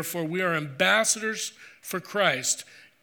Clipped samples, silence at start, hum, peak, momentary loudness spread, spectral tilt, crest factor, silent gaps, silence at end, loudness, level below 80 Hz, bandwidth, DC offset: under 0.1%; 0 s; none; -8 dBFS; 13 LU; -2 dB/octave; 20 dB; none; 0.2 s; -25 LUFS; -80 dBFS; over 20 kHz; under 0.1%